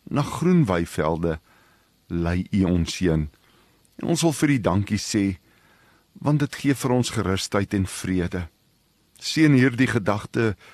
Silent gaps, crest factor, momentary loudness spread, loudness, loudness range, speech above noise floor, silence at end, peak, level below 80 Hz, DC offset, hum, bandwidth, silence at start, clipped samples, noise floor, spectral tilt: none; 18 dB; 10 LU; -23 LUFS; 2 LU; 41 dB; 0.2 s; -4 dBFS; -44 dBFS; under 0.1%; none; 13 kHz; 0.1 s; under 0.1%; -63 dBFS; -6 dB/octave